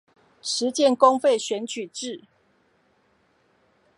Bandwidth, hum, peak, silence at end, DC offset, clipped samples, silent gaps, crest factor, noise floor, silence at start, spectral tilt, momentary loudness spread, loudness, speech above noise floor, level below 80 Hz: 11.5 kHz; none; -2 dBFS; 1.8 s; under 0.1%; under 0.1%; none; 22 dB; -65 dBFS; 0.45 s; -2.5 dB/octave; 17 LU; -23 LUFS; 43 dB; -80 dBFS